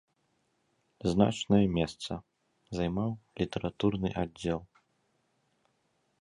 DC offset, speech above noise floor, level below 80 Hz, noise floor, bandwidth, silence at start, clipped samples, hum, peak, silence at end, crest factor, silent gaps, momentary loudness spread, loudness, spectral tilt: under 0.1%; 45 dB; -52 dBFS; -75 dBFS; 11 kHz; 1.05 s; under 0.1%; none; -10 dBFS; 1.55 s; 24 dB; none; 12 LU; -31 LUFS; -6.5 dB/octave